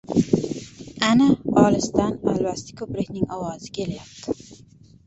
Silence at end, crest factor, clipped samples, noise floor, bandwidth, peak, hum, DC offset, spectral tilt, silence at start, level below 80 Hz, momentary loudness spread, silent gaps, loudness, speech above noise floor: 0.5 s; 20 dB; under 0.1%; -50 dBFS; 8.2 kHz; -2 dBFS; none; under 0.1%; -5.5 dB/octave; 0.1 s; -50 dBFS; 15 LU; none; -23 LUFS; 28 dB